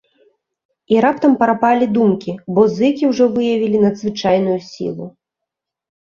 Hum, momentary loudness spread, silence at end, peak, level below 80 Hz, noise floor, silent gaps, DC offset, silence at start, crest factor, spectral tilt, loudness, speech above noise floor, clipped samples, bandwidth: none; 11 LU; 1 s; 0 dBFS; -58 dBFS; -82 dBFS; none; under 0.1%; 0.9 s; 16 dB; -7 dB/octave; -16 LUFS; 67 dB; under 0.1%; 7.2 kHz